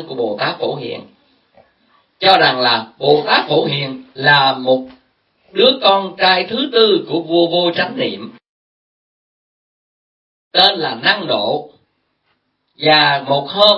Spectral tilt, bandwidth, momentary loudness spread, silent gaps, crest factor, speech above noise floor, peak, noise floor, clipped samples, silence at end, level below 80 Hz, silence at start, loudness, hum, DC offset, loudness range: -6 dB/octave; 11 kHz; 11 LU; 8.49-10.51 s; 16 dB; 51 dB; 0 dBFS; -66 dBFS; under 0.1%; 0 s; -62 dBFS; 0 s; -14 LUFS; none; under 0.1%; 6 LU